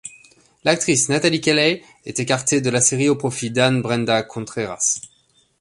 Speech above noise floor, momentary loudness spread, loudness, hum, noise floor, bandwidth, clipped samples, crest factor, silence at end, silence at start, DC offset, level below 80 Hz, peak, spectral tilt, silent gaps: 40 dB; 11 LU; -19 LUFS; none; -60 dBFS; 11.5 kHz; under 0.1%; 20 dB; 0.55 s; 0.05 s; under 0.1%; -58 dBFS; -2 dBFS; -3.5 dB/octave; none